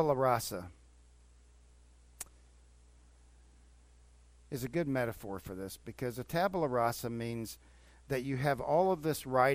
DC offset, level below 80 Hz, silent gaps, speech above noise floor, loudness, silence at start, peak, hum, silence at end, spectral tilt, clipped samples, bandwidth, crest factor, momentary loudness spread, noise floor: under 0.1%; -60 dBFS; none; 28 dB; -35 LUFS; 0 s; -14 dBFS; 60 Hz at -60 dBFS; 0 s; -5.5 dB/octave; under 0.1%; 16 kHz; 22 dB; 16 LU; -61 dBFS